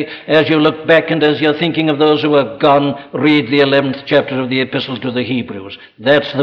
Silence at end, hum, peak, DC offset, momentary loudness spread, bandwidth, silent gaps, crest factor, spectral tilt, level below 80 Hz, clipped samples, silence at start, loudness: 0 s; none; 0 dBFS; under 0.1%; 8 LU; 6.2 kHz; none; 12 dB; -7.5 dB/octave; -56 dBFS; under 0.1%; 0 s; -13 LUFS